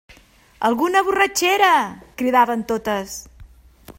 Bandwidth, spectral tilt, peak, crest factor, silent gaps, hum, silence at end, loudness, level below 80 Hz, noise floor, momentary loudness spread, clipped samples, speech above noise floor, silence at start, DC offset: 16.5 kHz; -2.5 dB/octave; -2 dBFS; 18 dB; none; none; 0.05 s; -18 LUFS; -52 dBFS; -50 dBFS; 11 LU; under 0.1%; 31 dB; 0.6 s; under 0.1%